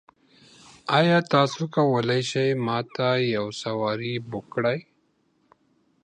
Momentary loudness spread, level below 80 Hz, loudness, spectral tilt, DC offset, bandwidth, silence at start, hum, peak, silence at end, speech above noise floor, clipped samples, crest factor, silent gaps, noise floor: 10 LU; -68 dBFS; -24 LUFS; -6 dB/octave; under 0.1%; 10.5 kHz; 0.85 s; none; -6 dBFS; 1.2 s; 44 dB; under 0.1%; 20 dB; none; -68 dBFS